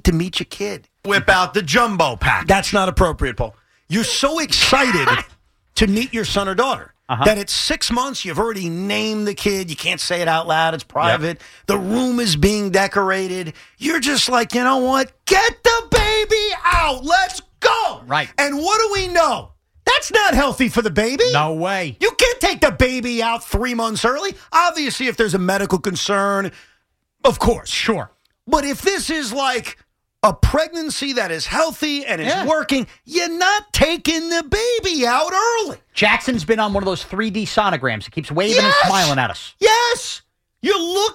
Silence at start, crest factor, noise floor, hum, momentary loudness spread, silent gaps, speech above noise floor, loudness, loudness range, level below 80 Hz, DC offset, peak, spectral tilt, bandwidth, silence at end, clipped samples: 0.05 s; 16 dB; -65 dBFS; none; 8 LU; none; 47 dB; -18 LUFS; 3 LU; -34 dBFS; under 0.1%; -2 dBFS; -3.5 dB/octave; 16.5 kHz; 0 s; under 0.1%